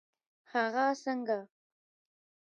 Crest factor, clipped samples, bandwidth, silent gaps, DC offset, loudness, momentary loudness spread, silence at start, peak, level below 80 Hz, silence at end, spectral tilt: 18 dB; under 0.1%; 9 kHz; none; under 0.1%; -33 LUFS; 7 LU; 0.55 s; -18 dBFS; under -90 dBFS; 0.95 s; -4 dB/octave